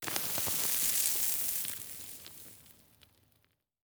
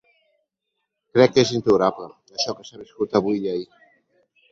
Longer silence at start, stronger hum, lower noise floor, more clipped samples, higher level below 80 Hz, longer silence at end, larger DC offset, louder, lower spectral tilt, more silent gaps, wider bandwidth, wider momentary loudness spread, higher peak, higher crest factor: second, 0 s vs 1.15 s; neither; second, -74 dBFS vs -79 dBFS; neither; second, -68 dBFS vs -58 dBFS; first, 1.15 s vs 0.85 s; neither; second, -30 LUFS vs -21 LUFS; second, 0 dB/octave vs -5 dB/octave; neither; first, over 20 kHz vs 7.8 kHz; about the same, 20 LU vs 19 LU; second, -10 dBFS vs -2 dBFS; about the same, 26 dB vs 22 dB